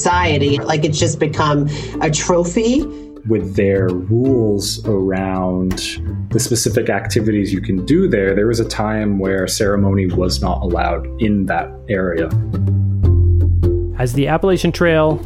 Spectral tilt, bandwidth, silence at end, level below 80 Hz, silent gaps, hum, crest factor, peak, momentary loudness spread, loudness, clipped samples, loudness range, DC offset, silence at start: -5.5 dB/octave; 15 kHz; 0 s; -28 dBFS; none; none; 14 dB; -2 dBFS; 6 LU; -16 LUFS; under 0.1%; 1 LU; under 0.1%; 0 s